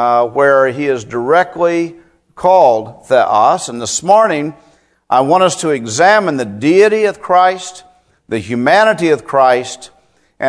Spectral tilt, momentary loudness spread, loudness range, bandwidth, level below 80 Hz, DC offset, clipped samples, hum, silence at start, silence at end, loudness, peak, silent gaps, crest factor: -4 dB/octave; 10 LU; 1 LU; 11 kHz; -56 dBFS; under 0.1%; 0.2%; none; 0 s; 0 s; -12 LUFS; 0 dBFS; none; 12 dB